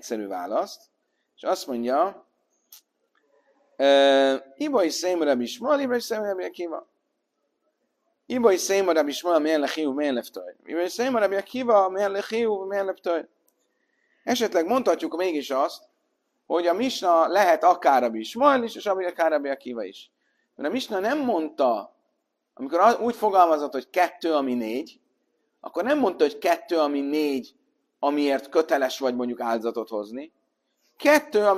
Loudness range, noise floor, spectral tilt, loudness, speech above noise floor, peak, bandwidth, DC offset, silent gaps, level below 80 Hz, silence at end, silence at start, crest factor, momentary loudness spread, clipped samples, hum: 5 LU; -76 dBFS; -3 dB/octave; -24 LUFS; 53 dB; -4 dBFS; 15 kHz; under 0.1%; none; -76 dBFS; 0 s; 0.05 s; 20 dB; 12 LU; under 0.1%; none